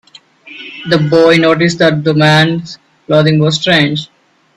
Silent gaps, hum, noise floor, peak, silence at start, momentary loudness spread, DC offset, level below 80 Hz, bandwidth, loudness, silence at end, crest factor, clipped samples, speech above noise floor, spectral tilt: none; none; -38 dBFS; 0 dBFS; 0.45 s; 15 LU; under 0.1%; -50 dBFS; 10.5 kHz; -10 LUFS; 0.5 s; 12 dB; under 0.1%; 29 dB; -6 dB/octave